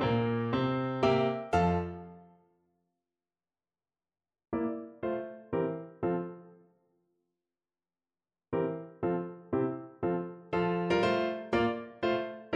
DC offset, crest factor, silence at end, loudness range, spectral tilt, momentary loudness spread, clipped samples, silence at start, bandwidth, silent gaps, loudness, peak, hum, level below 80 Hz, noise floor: under 0.1%; 20 dB; 0 s; 8 LU; -7.5 dB/octave; 9 LU; under 0.1%; 0 s; 9.2 kHz; none; -32 LUFS; -12 dBFS; none; -58 dBFS; under -90 dBFS